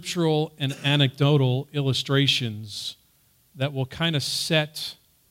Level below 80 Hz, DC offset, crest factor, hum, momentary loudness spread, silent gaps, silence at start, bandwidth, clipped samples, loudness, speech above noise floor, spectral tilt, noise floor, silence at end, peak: -62 dBFS; under 0.1%; 18 dB; none; 12 LU; none; 0 s; 16 kHz; under 0.1%; -24 LUFS; 38 dB; -5 dB/octave; -62 dBFS; 0.4 s; -6 dBFS